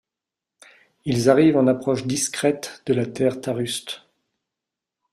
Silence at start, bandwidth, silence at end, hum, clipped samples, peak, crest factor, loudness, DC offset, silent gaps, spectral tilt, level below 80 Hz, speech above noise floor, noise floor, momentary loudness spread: 1.05 s; 14 kHz; 1.15 s; none; under 0.1%; -4 dBFS; 20 dB; -21 LUFS; under 0.1%; none; -5 dB/octave; -60 dBFS; 66 dB; -87 dBFS; 13 LU